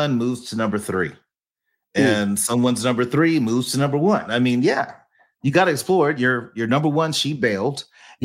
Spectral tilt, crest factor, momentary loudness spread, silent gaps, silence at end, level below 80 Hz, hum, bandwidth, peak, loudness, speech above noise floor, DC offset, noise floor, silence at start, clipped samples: -5 dB/octave; 18 dB; 7 LU; none; 0 s; -64 dBFS; none; 16.5 kHz; -2 dBFS; -20 LUFS; 59 dB; under 0.1%; -78 dBFS; 0 s; under 0.1%